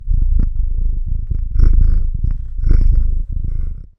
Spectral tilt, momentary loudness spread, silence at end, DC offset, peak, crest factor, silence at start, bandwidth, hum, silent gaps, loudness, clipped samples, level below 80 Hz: -10.5 dB/octave; 8 LU; 0.1 s; 1%; -2 dBFS; 12 dB; 0 s; 1.6 kHz; none; none; -20 LUFS; under 0.1%; -14 dBFS